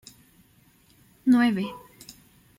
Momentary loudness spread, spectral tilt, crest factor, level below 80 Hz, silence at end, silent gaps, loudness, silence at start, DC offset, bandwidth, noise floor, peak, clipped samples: 26 LU; -6 dB/octave; 18 dB; -66 dBFS; 0.45 s; none; -24 LUFS; 1.25 s; under 0.1%; 15.5 kHz; -60 dBFS; -10 dBFS; under 0.1%